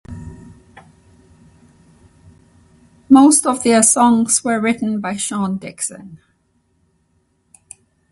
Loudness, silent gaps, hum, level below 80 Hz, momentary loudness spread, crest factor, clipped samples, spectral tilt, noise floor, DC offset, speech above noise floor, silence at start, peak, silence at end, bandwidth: -14 LUFS; none; none; -52 dBFS; 21 LU; 18 dB; under 0.1%; -3.5 dB/octave; -63 dBFS; under 0.1%; 48 dB; 0.1 s; 0 dBFS; 1.95 s; 12 kHz